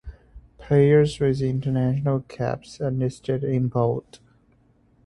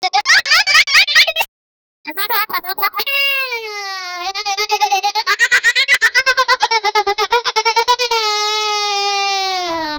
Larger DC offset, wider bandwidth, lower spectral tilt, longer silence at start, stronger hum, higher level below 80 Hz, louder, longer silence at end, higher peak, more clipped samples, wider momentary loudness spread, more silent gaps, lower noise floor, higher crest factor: neither; second, 11 kHz vs over 20 kHz; first, -8 dB/octave vs 1.5 dB/octave; about the same, 0.05 s vs 0 s; neither; first, -48 dBFS vs -54 dBFS; second, -23 LUFS vs -13 LUFS; first, 1.05 s vs 0 s; second, -6 dBFS vs 0 dBFS; neither; about the same, 11 LU vs 12 LU; second, none vs 1.48-2.04 s; second, -60 dBFS vs under -90 dBFS; about the same, 18 dB vs 16 dB